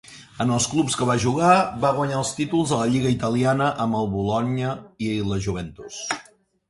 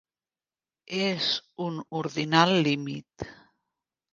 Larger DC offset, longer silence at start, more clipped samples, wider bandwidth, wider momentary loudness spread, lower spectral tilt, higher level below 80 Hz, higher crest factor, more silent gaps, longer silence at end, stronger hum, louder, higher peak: neither; second, 0.1 s vs 0.9 s; neither; first, 11.5 kHz vs 7.6 kHz; second, 11 LU vs 18 LU; about the same, -5 dB/octave vs -5 dB/octave; first, -48 dBFS vs -64 dBFS; second, 18 dB vs 24 dB; neither; second, 0.45 s vs 0.8 s; neither; first, -22 LUFS vs -26 LUFS; about the same, -4 dBFS vs -4 dBFS